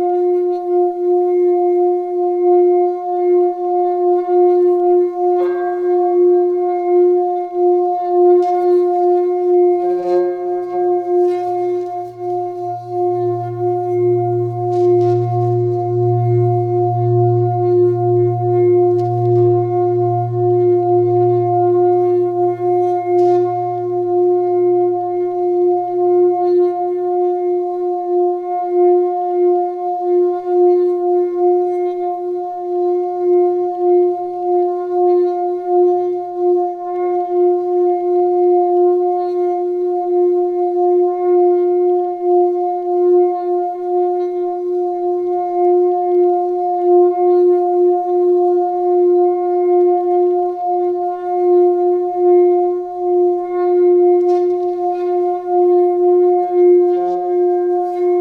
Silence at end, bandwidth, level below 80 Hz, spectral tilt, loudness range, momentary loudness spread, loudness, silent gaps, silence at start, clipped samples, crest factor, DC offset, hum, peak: 0 s; 2.3 kHz; -70 dBFS; -11 dB/octave; 3 LU; 6 LU; -15 LUFS; none; 0 s; under 0.1%; 10 dB; under 0.1%; none; -4 dBFS